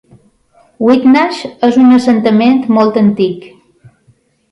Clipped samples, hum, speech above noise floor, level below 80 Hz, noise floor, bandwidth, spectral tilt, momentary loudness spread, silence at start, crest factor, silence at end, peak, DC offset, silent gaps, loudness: under 0.1%; none; 43 dB; -54 dBFS; -52 dBFS; 10.5 kHz; -7 dB/octave; 8 LU; 0.8 s; 10 dB; 1.05 s; 0 dBFS; under 0.1%; none; -10 LUFS